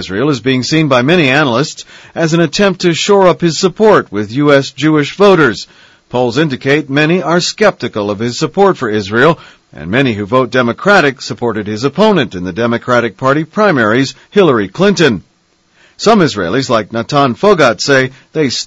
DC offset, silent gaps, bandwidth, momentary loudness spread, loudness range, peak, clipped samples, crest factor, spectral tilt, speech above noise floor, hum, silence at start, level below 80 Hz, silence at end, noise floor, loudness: under 0.1%; none; 8.2 kHz; 8 LU; 2 LU; 0 dBFS; 0.6%; 12 dB; -5 dB/octave; 43 dB; none; 0 s; -46 dBFS; 0 s; -54 dBFS; -11 LUFS